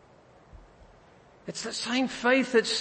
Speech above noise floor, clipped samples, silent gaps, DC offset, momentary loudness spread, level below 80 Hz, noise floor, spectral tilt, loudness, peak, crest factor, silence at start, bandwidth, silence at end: 30 dB; under 0.1%; none; under 0.1%; 16 LU; -60 dBFS; -56 dBFS; -2.5 dB/octave; -26 LUFS; -10 dBFS; 20 dB; 0.55 s; 8.8 kHz; 0 s